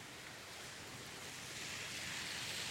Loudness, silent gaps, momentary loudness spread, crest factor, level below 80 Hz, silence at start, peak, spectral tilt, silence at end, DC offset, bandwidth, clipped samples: -45 LUFS; none; 8 LU; 16 dB; -72 dBFS; 0 s; -30 dBFS; -1.5 dB/octave; 0 s; under 0.1%; 16 kHz; under 0.1%